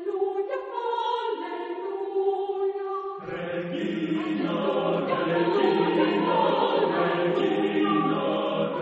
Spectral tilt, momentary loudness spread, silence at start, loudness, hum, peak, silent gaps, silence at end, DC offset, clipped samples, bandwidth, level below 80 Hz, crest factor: -7.5 dB/octave; 9 LU; 0 s; -26 LUFS; none; -10 dBFS; none; 0 s; under 0.1%; under 0.1%; 7.6 kHz; -70 dBFS; 16 dB